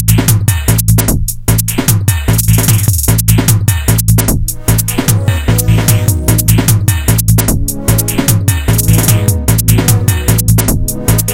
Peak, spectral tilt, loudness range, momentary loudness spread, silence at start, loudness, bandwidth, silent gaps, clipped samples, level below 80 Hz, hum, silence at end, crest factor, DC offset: 0 dBFS; -4.5 dB/octave; 0 LU; 3 LU; 0 s; -10 LUFS; over 20 kHz; none; 0.6%; -18 dBFS; none; 0 s; 10 dB; under 0.1%